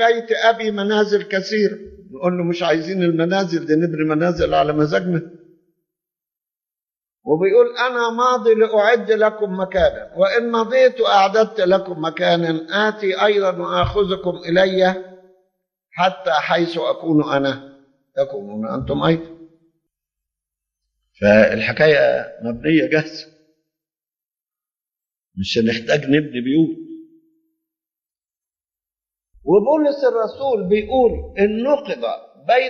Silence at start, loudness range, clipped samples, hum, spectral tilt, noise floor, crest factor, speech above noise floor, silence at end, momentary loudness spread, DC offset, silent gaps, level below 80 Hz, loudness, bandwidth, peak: 0 s; 7 LU; under 0.1%; none; -6 dB/octave; under -90 dBFS; 18 dB; over 73 dB; 0 s; 10 LU; under 0.1%; none; -46 dBFS; -18 LUFS; 7.2 kHz; 0 dBFS